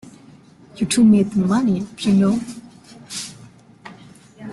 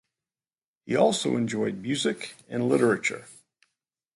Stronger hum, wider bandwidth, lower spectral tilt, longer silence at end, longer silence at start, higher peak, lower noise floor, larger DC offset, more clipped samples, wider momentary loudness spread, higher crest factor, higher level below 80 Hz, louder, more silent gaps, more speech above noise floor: neither; about the same, 12 kHz vs 11.5 kHz; first, -6 dB/octave vs -4.5 dB/octave; second, 0 s vs 0.85 s; second, 0.05 s vs 0.85 s; first, -4 dBFS vs -8 dBFS; second, -46 dBFS vs under -90 dBFS; neither; neither; first, 22 LU vs 10 LU; about the same, 16 dB vs 20 dB; first, -54 dBFS vs -70 dBFS; first, -18 LUFS vs -26 LUFS; neither; second, 30 dB vs over 64 dB